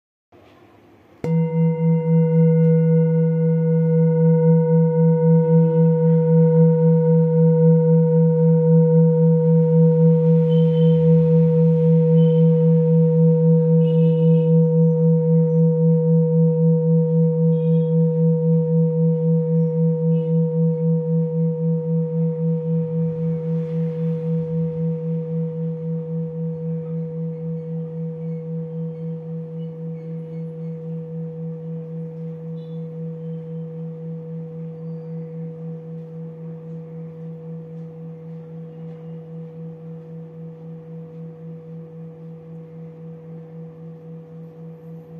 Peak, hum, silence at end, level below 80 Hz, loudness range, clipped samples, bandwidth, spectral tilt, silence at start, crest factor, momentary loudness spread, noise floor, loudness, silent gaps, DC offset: -6 dBFS; none; 0 s; -68 dBFS; 20 LU; under 0.1%; 3.2 kHz; -13 dB/octave; 1.25 s; 12 dB; 21 LU; -50 dBFS; -18 LUFS; none; under 0.1%